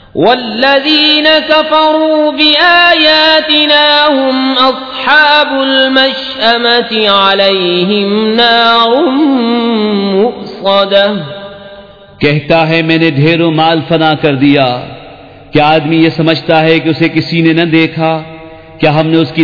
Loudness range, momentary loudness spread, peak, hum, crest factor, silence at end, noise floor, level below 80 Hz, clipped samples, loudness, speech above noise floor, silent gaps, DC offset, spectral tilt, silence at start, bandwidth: 5 LU; 7 LU; 0 dBFS; none; 8 dB; 0 s; -33 dBFS; -46 dBFS; 1%; -8 LUFS; 25 dB; none; 0.4%; -7 dB/octave; 0.15 s; 5.4 kHz